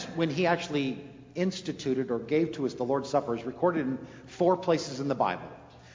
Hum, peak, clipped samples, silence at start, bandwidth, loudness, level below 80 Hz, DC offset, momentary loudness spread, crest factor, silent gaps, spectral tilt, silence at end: none; -12 dBFS; under 0.1%; 0 s; 7.6 kHz; -29 LUFS; -64 dBFS; under 0.1%; 12 LU; 18 dB; none; -6 dB/octave; 0 s